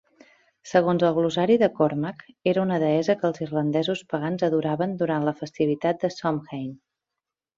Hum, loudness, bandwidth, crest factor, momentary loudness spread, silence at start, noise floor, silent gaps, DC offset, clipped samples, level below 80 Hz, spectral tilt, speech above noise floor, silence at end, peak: none; -24 LUFS; 7.6 kHz; 18 dB; 8 LU; 0.65 s; -87 dBFS; none; under 0.1%; under 0.1%; -66 dBFS; -7 dB/octave; 63 dB; 0.8 s; -6 dBFS